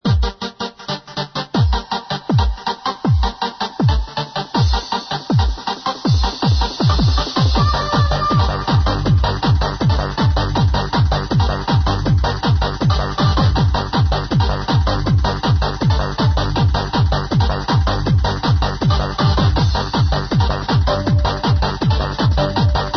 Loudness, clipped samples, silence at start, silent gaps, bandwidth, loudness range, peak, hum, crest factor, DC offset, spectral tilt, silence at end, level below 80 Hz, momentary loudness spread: -17 LUFS; under 0.1%; 0.05 s; none; 6.4 kHz; 3 LU; -4 dBFS; none; 12 dB; under 0.1%; -6.5 dB/octave; 0 s; -22 dBFS; 6 LU